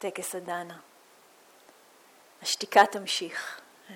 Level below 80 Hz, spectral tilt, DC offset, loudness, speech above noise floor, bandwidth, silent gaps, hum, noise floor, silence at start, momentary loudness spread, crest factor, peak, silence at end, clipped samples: -84 dBFS; -1.5 dB/octave; under 0.1%; -27 LUFS; 30 dB; 17.5 kHz; none; none; -58 dBFS; 0 s; 22 LU; 26 dB; -6 dBFS; 0 s; under 0.1%